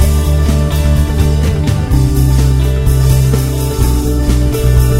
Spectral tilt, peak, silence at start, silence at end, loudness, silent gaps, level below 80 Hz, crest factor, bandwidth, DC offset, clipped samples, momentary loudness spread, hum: -6.5 dB/octave; 0 dBFS; 0 s; 0 s; -12 LUFS; none; -12 dBFS; 10 dB; 16.5 kHz; 2%; under 0.1%; 3 LU; none